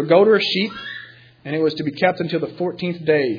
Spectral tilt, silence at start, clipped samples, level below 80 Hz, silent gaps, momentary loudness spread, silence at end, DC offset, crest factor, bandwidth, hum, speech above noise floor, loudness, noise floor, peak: -7 dB/octave; 0 s; under 0.1%; -64 dBFS; none; 17 LU; 0 s; under 0.1%; 18 dB; 5.2 kHz; none; 21 dB; -19 LUFS; -40 dBFS; -2 dBFS